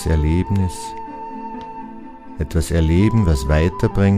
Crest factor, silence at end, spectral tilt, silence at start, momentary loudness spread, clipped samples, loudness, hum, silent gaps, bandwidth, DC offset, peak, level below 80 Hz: 16 dB; 0 s; -7 dB/octave; 0 s; 18 LU; under 0.1%; -18 LUFS; none; none; 15 kHz; under 0.1%; -2 dBFS; -26 dBFS